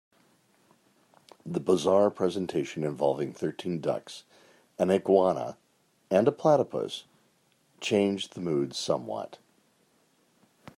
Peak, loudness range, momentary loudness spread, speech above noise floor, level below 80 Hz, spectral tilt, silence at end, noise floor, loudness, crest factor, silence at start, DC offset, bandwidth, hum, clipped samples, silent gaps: -8 dBFS; 5 LU; 14 LU; 41 dB; -74 dBFS; -6 dB/octave; 1.4 s; -68 dBFS; -28 LUFS; 22 dB; 1.45 s; under 0.1%; 13 kHz; none; under 0.1%; none